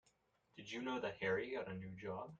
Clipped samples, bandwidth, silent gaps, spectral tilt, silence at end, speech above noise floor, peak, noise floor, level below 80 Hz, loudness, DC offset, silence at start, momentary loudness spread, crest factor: under 0.1%; 7.8 kHz; none; -5.5 dB/octave; 0.05 s; 35 dB; -28 dBFS; -79 dBFS; -76 dBFS; -44 LUFS; under 0.1%; 0.55 s; 12 LU; 18 dB